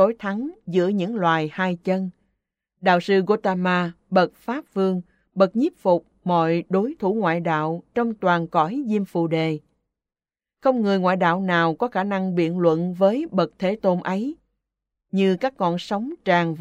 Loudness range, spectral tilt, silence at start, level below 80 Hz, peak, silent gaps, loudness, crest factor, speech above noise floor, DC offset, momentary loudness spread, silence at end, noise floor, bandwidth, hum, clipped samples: 2 LU; -7.5 dB/octave; 0 s; -66 dBFS; -4 dBFS; none; -22 LUFS; 18 dB; over 69 dB; under 0.1%; 6 LU; 0 s; under -90 dBFS; 8.2 kHz; none; under 0.1%